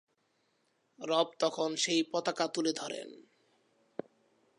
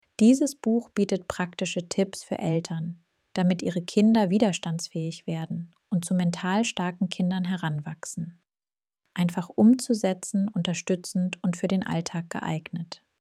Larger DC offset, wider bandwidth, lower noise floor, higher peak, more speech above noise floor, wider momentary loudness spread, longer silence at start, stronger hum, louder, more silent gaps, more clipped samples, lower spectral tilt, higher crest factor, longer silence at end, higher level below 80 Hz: neither; second, 11 kHz vs 13.5 kHz; second, -76 dBFS vs under -90 dBFS; second, -14 dBFS vs -8 dBFS; second, 43 dB vs over 64 dB; first, 17 LU vs 14 LU; first, 1 s vs 0.2 s; neither; second, -32 LUFS vs -26 LUFS; neither; neither; second, -2.5 dB/octave vs -6 dB/octave; about the same, 22 dB vs 18 dB; first, 1.4 s vs 0.25 s; second, -90 dBFS vs -66 dBFS